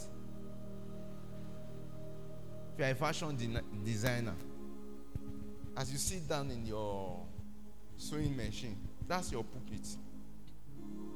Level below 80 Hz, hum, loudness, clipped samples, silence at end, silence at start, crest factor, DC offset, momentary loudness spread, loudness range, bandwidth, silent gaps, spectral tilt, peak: -54 dBFS; none; -42 LUFS; under 0.1%; 0 s; 0 s; 28 dB; 0.8%; 15 LU; 3 LU; 18 kHz; none; -5 dB/octave; -14 dBFS